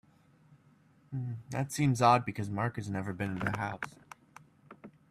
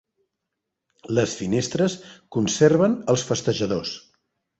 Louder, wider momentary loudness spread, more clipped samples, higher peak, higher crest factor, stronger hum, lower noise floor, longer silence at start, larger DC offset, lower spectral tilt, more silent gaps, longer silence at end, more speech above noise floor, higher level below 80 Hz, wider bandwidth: second, -32 LUFS vs -22 LUFS; first, 27 LU vs 13 LU; neither; second, -12 dBFS vs -4 dBFS; about the same, 22 dB vs 20 dB; neither; second, -64 dBFS vs -82 dBFS; about the same, 1.1 s vs 1.05 s; neither; about the same, -6 dB/octave vs -5 dB/octave; neither; second, 0.2 s vs 0.6 s; second, 32 dB vs 60 dB; second, -66 dBFS vs -56 dBFS; first, 14.5 kHz vs 8.2 kHz